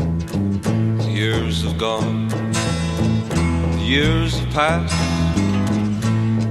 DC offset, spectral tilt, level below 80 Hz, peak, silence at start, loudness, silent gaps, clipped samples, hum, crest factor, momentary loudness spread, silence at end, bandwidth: under 0.1%; -6 dB/octave; -32 dBFS; -2 dBFS; 0 s; -19 LUFS; none; under 0.1%; none; 16 dB; 3 LU; 0 s; 13 kHz